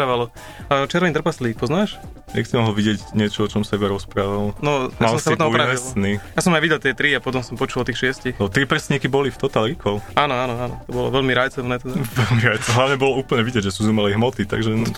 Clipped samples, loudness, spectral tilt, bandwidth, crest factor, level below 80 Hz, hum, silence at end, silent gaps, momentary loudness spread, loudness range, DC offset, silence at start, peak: under 0.1%; -20 LUFS; -5 dB/octave; 16.5 kHz; 20 dB; -42 dBFS; none; 0 s; none; 7 LU; 2 LU; under 0.1%; 0 s; 0 dBFS